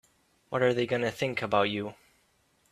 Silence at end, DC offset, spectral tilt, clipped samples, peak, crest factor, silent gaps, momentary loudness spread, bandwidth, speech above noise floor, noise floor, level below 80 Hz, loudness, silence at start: 0.8 s; under 0.1%; -5.5 dB/octave; under 0.1%; -10 dBFS; 20 dB; none; 9 LU; 14 kHz; 41 dB; -69 dBFS; -68 dBFS; -29 LUFS; 0.5 s